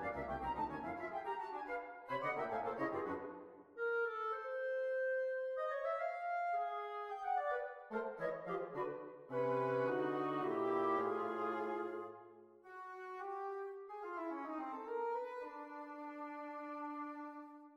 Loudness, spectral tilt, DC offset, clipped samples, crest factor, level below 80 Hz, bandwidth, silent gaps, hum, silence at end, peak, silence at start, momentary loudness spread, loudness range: -42 LUFS; -7.5 dB/octave; under 0.1%; under 0.1%; 16 dB; -72 dBFS; 8.4 kHz; none; none; 0 s; -26 dBFS; 0 s; 12 LU; 7 LU